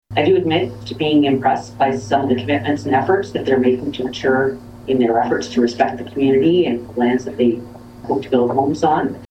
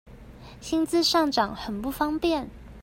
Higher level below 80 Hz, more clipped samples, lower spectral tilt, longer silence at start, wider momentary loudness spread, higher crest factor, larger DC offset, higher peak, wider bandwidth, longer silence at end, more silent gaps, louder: about the same, -50 dBFS vs -48 dBFS; neither; first, -6.5 dB/octave vs -3.5 dB/octave; about the same, 0.1 s vs 0.05 s; second, 7 LU vs 11 LU; about the same, 16 dB vs 18 dB; neither; first, -2 dBFS vs -8 dBFS; second, 8.8 kHz vs 16 kHz; about the same, 0.05 s vs 0 s; neither; first, -18 LUFS vs -25 LUFS